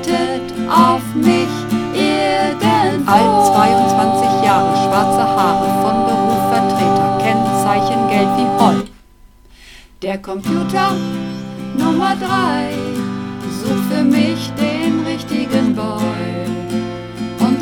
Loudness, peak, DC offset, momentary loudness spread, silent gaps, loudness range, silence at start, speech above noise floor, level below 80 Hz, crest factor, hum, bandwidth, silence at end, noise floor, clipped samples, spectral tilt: -15 LUFS; 0 dBFS; under 0.1%; 10 LU; none; 6 LU; 0 s; 29 dB; -44 dBFS; 16 dB; none; 18.5 kHz; 0 s; -44 dBFS; under 0.1%; -5.5 dB/octave